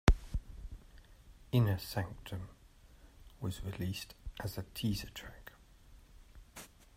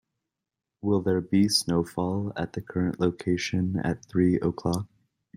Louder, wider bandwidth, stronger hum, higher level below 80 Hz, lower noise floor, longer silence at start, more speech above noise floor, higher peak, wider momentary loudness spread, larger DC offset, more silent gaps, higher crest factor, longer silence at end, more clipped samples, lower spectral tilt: second, -39 LUFS vs -27 LUFS; about the same, 16 kHz vs 15.5 kHz; neither; first, -44 dBFS vs -56 dBFS; second, -60 dBFS vs -87 dBFS; second, 0.05 s vs 0.85 s; second, 23 dB vs 61 dB; about the same, -8 dBFS vs -8 dBFS; first, 21 LU vs 9 LU; neither; neither; first, 30 dB vs 18 dB; second, 0.3 s vs 0.5 s; neither; about the same, -6 dB/octave vs -5.5 dB/octave